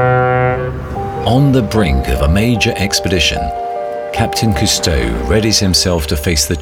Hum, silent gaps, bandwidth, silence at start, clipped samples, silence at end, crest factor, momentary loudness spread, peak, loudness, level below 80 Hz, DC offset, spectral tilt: none; none; 18 kHz; 0 s; under 0.1%; 0 s; 12 dB; 9 LU; 0 dBFS; -14 LUFS; -24 dBFS; under 0.1%; -4.5 dB/octave